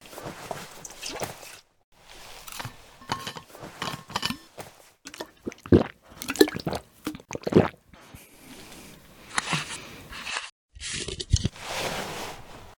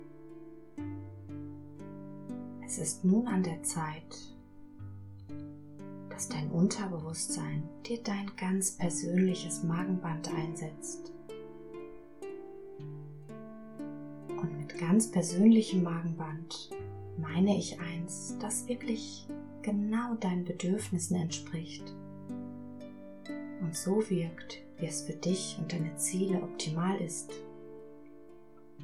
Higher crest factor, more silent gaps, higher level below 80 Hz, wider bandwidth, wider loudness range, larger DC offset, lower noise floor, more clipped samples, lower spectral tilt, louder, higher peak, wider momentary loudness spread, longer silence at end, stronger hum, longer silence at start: first, 30 dB vs 22 dB; first, 1.84-1.92 s, 10.52-10.69 s vs none; first, -44 dBFS vs -66 dBFS; first, 19.5 kHz vs 13.5 kHz; about the same, 11 LU vs 9 LU; second, under 0.1% vs 0.2%; second, -50 dBFS vs -56 dBFS; neither; about the same, -4.5 dB/octave vs -5.5 dB/octave; first, -29 LUFS vs -34 LUFS; first, 0 dBFS vs -14 dBFS; first, 23 LU vs 19 LU; about the same, 0.05 s vs 0 s; neither; about the same, 0 s vs 0 s